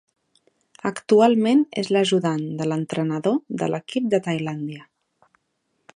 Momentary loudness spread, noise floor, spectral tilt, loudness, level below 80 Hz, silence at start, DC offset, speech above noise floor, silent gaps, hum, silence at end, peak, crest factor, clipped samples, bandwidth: 13 LU; -73 dBFS; -6 dB/octave; -22 LUFS; -70 dBFS; 0.85 s; under 0.1%; 52 dB; none; none; 1.1 s; -4 dBFS; 20 dB; under 0.1%; 11 kHz